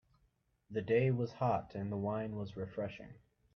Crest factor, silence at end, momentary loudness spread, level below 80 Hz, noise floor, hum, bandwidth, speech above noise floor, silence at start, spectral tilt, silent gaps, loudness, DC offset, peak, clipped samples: 20 dB; 0.4 s; 12 LU; -68 dBFS; -76 dBFS; none; 6.4 kHz; 40 dB; 0.7 s; -9 dB/octave; none; -37 LUFS; under 0.1%; -18 dBFS; under 0.1%